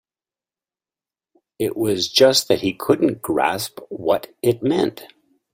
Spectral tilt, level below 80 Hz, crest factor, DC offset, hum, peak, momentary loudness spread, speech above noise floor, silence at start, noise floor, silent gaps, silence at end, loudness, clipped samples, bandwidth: -4 dB/octave; -58 dBFS; 20 dB; under 0.1%; none; -2 dBFS; 12 LU; over 71 dB; 1.6 s; under -90 dBFS; none; 0.5 s; -19 LUFS; under 0.1%; 16.5 kHz